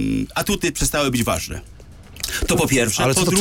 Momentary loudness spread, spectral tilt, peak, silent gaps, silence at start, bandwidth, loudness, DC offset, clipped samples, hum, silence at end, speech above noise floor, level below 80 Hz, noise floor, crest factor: 10 LU; -3.5 dB/octave; -4 dBFS; none; 0 s; 17 kHz; -19 LUFS; under 0.1%; under 0.1%; none; 0 s; 20 dB; -34 dBFS; -40 dBFS; 16 dB